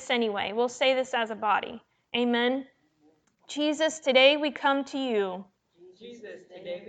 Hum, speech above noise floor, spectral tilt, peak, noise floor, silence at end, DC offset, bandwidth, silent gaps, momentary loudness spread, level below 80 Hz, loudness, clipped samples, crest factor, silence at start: none; 39 dB; -3 dB/octave; -6 dBFS; -66 dBFS; 0 s; under 0.1%; 9.2 kHz; none; 23 LU; -76 dBFS; -26 LUFS; under 0.1%; 22 dB; 0 s